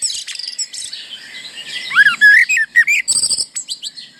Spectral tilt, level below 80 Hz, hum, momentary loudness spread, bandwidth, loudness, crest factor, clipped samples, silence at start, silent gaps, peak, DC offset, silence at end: 3 dB/octave; -64 dBFS; none; 21 LU; 19 kHz; -12 LUFS; 14 dB; under 0.1%; 0 s; none; -2 dBFS; under 0.1%; 0.15 s